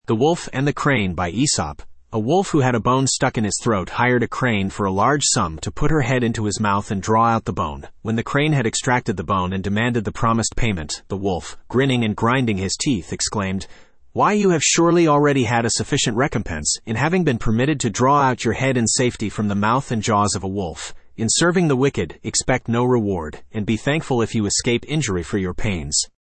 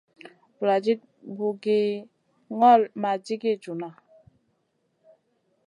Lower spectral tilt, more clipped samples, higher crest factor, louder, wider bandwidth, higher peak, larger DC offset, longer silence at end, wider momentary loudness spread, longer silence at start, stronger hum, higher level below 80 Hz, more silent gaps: second, -4.5 dB/octave vs -6.5 dB/octave; neither; about the same, 16 dB vs 20 dB; first, -20 LUFS vs -24 LUFS; second, 8.8 kHz vs 11 kHz; about the same, -4 dBFS vs -6 dBFS; neither; second, 0.3 s vs 1.75 s; second, 9 LU vs 18 LU; second, 0.1 s vs 0.6 s; neither; first, -40 dBFS vs -80 dBFS; neither